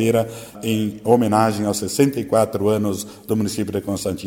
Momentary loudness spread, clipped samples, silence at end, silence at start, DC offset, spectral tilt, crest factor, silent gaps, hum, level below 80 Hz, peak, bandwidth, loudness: 7 LU; under 0.1%; 0 s; 0 s; under 0.1%; -5.5 dB/octave; 20 dB; none; none; -54 dBFS; 0 dBFS; 17 kHz; -20 LUFS